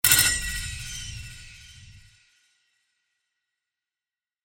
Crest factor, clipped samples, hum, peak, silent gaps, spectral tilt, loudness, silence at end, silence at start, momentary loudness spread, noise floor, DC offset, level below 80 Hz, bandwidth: 28 dB; under 0.1%; none; -2 dBFS; none; 0 dB/octave; -24 LUFS; 2.45 s; 0.05 s; 28 LU; under -90 dBFS; under 0.1%; -44 dBFS; 19 kHz